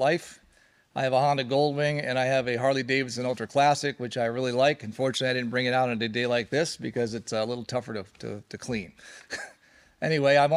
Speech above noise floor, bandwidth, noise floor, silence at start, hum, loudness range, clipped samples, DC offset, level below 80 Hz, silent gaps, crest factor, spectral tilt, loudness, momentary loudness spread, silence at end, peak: 35 dB; 13 kHz; -62 dBFS; 0 s; none; 6 LU; under 0.1%; under 0.1%; -66 dBFS; none; 18 dB; -5 dB/octave; -27 LUFS; 14 LU; 0 s; -8 dBFS